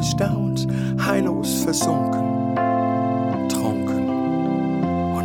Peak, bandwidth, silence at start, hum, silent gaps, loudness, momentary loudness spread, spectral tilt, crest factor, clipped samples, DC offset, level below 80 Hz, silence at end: -6 dBFS; 18.5 kHz; 0 s; none; none; -21 LUFS; 2 LU; -5.5 dB/octave; 16 dB; under 0.1%; under 0.1%; -46 dBFS; 0 s